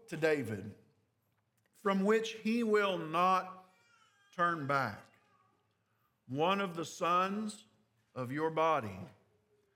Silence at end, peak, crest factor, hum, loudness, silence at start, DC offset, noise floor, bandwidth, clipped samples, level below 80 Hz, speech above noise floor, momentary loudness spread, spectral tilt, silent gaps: 0.65 s; -16 dBFS; 20 dB; none; -34 LUFS; 0.1 s; under 0.1%; -78 dBFS; 17 kHz; under 0.1%; -86 dBFS; 45 dB; 18 LU; -5.5 dB/octave; none